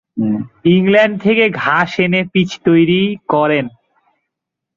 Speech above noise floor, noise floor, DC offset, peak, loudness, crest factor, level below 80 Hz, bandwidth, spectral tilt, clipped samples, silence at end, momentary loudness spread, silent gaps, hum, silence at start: 66 dB; -79 dBFS; under 0.1%; -2 dBFS; -14 LUFS; 14 dB; -54 dBFS; 7.4 kHz; -7 dB/octave; under 0.1%; 1.05 s; 7 LU; none; none; 0.15 s